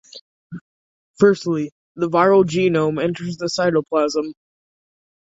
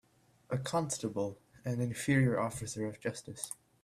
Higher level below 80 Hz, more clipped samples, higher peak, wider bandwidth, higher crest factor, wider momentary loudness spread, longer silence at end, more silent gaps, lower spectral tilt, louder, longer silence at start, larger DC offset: about the same, -62 dBFS vs -64 dBFS; neither; first, -2 dBFS vs -16 dBFS; second, 8 kHz vs 14.5 kHz; about the same, 18 dB vs 20 dB; first, 19 LU vs 13 LU; first, 0.9 s vs 0.3 s; first, 0.21-0.50 s, 0.61-1.14 s, 1.72-1.95 s vs none; about the same, -6 dB/octave vs -5.5 dB/octave; first, -19 LUFS vs -35 LUFS; second, 0.15 s vs 0.5 s; neither